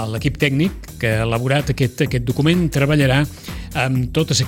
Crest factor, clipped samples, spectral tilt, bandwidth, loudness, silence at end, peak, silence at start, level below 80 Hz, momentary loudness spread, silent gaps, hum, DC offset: 14 dB; under 0.1%; -5.5 dB/octave; 16.5 kHz; -18 LUFS; 0 s; -4 dBFS; 0 s; -34 dBFS; 7 LU; none; none; under 0.1%